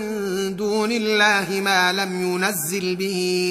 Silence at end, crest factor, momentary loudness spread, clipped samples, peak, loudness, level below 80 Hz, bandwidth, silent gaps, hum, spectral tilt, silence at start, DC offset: 0 s; 18 dB; 7 LU; under 0.1%; -4 dBFS; -20 LUFS; -62 dBFS; 15.5 kHz; none; none; -3.5 dB/octave; 0 s; under 0.1%